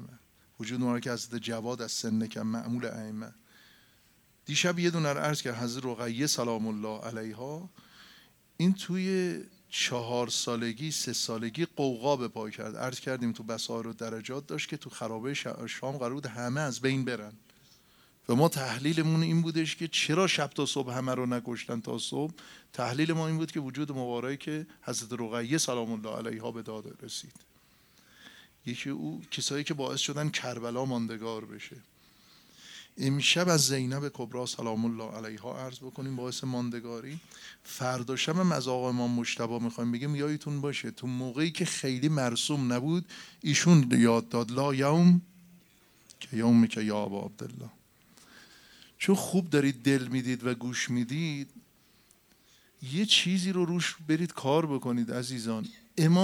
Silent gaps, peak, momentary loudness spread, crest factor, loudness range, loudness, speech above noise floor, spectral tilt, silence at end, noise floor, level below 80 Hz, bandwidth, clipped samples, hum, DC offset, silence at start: none; -8 dBFS; 15 LU; 22 dB; 9 LU; -30 LUFS; 34 dB; -4.5 dB/octave; 0 s; -64 dBFS; -74 dBFS; 17 kHz; under 0.1%; none; under 0.1%; 0 s